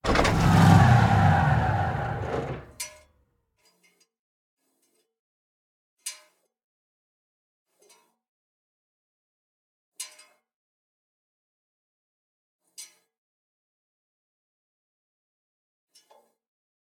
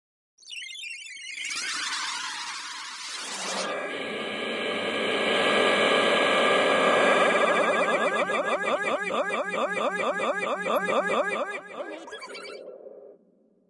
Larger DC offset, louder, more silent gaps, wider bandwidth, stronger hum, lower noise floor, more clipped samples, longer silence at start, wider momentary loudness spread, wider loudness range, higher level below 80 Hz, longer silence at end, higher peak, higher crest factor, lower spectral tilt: neither; first, -21 LUFS vs -25 LUFS; first, 4.19-4.57 s, 5.19-5.97 s, 6.64-7.66 s, 8.28-9.92 s, 10.54-12.59 s vs none; first, 15.5 kHz vs 12 kHz; neither; first, -72 dBFS vs -63 dBFS; neither; second, 0.05 s vs 0.45 s; first, 23 LU vs 17 LU; first, 26 LU vs 9 LU; first, -44 dBFS vs -78 dBFS; first, 4.05 s vs 0.55 s; first, -6 dBFS vs -10 dBFS; first, 24 dB vs 16 dB; first, -6 dB/octave vs -2.5 dB/octave